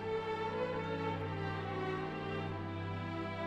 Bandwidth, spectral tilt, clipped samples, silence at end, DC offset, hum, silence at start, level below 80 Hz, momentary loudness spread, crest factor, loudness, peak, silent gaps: 8.4 kHz; -7.5 dB/octave; under 0.1%; 0 s; under 0.1%; none; 0 s; -62 dBFS; 3 LU; 12 dB; -39 LUFS; -26 dBFS; none